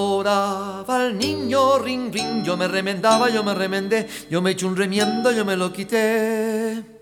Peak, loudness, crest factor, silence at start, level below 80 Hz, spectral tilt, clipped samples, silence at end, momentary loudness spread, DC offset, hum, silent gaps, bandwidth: -4 dBFS; -21 LUFS; 16 dB; 0 s; -62 dBFS; -4.5 dB/octave; under 0.1%; 0.05 s; 6 LU; under 0.1%; none; none; 19 kHz